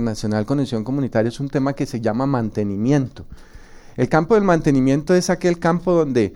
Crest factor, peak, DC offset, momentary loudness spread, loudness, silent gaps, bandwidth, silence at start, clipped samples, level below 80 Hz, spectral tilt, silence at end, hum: 16 dB; -4 dBFS; under 0.1%; 7 LU; -19 LUFS; none; 16 kHz; 0 s; under 0.1%; -42 dBFS; -7 dB/octave; 0 s; none